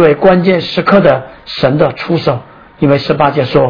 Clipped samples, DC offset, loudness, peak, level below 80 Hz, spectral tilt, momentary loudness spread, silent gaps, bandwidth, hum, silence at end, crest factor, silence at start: 0.7%; 0.5%; -11 LUFS; 0 dBFS; -42 dBFS; -8.5 dB/octave; 8 LU; none; 5.4 kHz; none; 0 s; 10 dB; 0 s